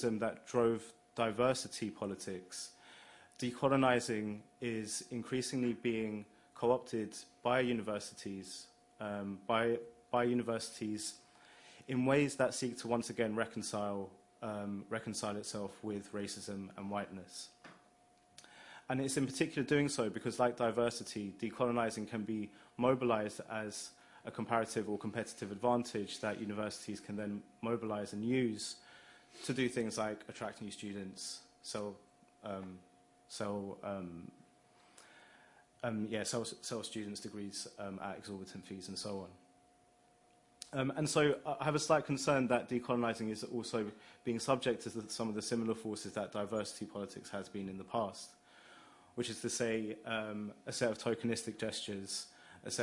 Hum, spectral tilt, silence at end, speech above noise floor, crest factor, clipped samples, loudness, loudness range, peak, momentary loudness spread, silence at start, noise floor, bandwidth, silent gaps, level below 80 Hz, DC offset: none; -4.5 dB/octave; 0 s; 31 dB; 24 dB; under 0.1%; -38 LUFS; 9 LU; -16 dBFS; 15 LU; 0 s; -69 dBFS; 11.5 kHz; none; -74 dBFS; under 0.1%